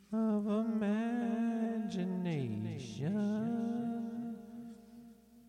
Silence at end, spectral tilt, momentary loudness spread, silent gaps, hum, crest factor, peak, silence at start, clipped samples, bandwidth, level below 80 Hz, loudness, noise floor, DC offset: 0 s; -8 dB/octave; 16 LU; none; none; 12 dB; -24 dBFS; 0.1 s; under 0.1%; 9.6 kHz; -74 dBFS; -36 LUFS; -57 dBFS; under 0.1%